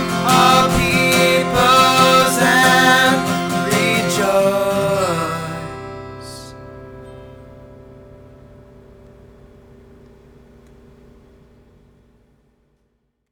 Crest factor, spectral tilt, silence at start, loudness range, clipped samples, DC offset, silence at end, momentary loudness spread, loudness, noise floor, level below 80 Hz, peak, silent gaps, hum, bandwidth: 18 dB; -3.5 dB/octave; 0 s; 22 LU; under 0.1%; under 0.1%; 5.8 s; 23 LU; -14 LUFS; -67 dBFS; -42 dBFS; 0 dBFS; none; none; over 20 kHz